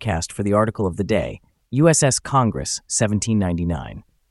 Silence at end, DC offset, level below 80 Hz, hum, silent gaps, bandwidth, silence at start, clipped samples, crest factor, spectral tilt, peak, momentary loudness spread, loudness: 0.3 s; under 0.1%; -40 dBFS; none; none; 12 kHz; 0 s; under 0.1%; 18 dB; -5 dB/octave; -4 dBFS; 10 LU; -20 LUFS